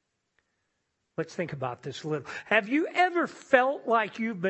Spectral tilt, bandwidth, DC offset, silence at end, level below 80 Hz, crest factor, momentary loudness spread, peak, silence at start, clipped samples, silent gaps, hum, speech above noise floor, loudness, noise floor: -5.5 dB/octave; 8.4 kHz; under 0.1%; 0 s; -74 dBFS; 24 dB; 12 LU; -4 dBFS; 1.2 s; under 0.1%; none; none; 51 dB; -28 LUFS; -79 dBFS